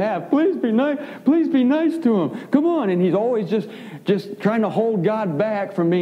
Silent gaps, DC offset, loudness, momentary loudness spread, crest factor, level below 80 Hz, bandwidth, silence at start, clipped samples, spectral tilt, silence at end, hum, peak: none; under 0.1%; -20 LUFS; 5 LU; 16 dB; -80 dBFS; 11 kHz; 0 s; under 0.1%; -8.5 dB/octave; 0 s; none; -4 dBFS